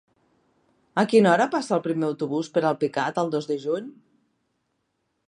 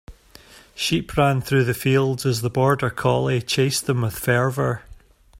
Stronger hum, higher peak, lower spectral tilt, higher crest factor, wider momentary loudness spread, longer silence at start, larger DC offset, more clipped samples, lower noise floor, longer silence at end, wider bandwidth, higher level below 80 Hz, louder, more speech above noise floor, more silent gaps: neither; about the same, -4 dBFS vs -4 dBFS; about the same, -6 dB/octave vs -5 dB/octave; about the same, 20 dB vs 18 dB; first, 11 LU vs 5 LU; first, 0.95 s vs 0.1 s; neither; neither; first, -75 dBFS vs -48 dBFS; first, 1.35 s vs 0.45 s; second, 11 kHz vs 16 kHz; second, -74 dBFS vs -46 dBFS; second, -24 LUFS vs -21 LUFS; first, 52 dB vs 27 dB; neither